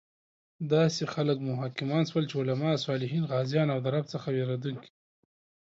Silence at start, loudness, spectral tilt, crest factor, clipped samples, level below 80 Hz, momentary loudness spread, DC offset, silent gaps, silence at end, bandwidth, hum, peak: 0.6 s; -30 LUFS; -6.5 dB/octave; 16 dB; under 0.1%; -72 dBFS; 7 LU; under 0.1%; none; 0.8 s; 7.8 kHz; none; -14 dBFS